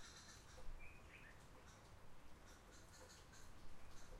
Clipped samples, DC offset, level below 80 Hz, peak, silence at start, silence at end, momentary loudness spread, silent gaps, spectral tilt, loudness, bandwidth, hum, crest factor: under 0.1%; under 0.1%; -62 dBFS; -40 dBFS; 0 s; 0 s; 4 LU; none; -3.5 dB/octave; -63 LUFS; 15.5 kHz; none; 16 dB